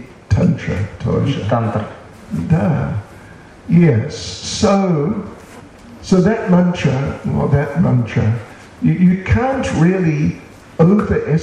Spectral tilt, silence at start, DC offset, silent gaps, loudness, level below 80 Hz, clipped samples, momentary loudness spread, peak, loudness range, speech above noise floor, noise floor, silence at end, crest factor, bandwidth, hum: -7 dB/octave; 0 s; under 0.1%; none; -16 LUFS; -36 dBFS; under 0.1%; 13 LU; -2 dBFS; 3 LU; 24 dB; -38 dBFS; 0 s; 14 dB; 9.8 kHz; none